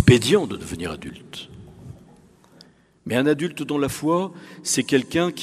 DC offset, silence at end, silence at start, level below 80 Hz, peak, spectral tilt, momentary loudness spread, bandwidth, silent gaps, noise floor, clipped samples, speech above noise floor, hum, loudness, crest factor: under 0.1%; 0 s; 0 s; -46 dBFS; -2 dBFS; -5 dB/octave; 21 LU; 15.5 kHz; none; -53 dBFS; under 0.1%; 30 dB; none; -22 LUFS; 22 dB